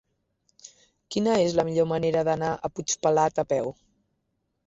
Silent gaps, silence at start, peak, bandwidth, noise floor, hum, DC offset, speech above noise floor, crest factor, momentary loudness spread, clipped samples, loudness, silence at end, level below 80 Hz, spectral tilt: none; 0.65 s; -10 dBFS; 8 kHz; -76 dBFS; none; under 0.1%; 52 dB; 18 dB; 7 LU; under 0.1%; -25 LUFS; 0.95 s; -60 dBFS; -5 dB/octave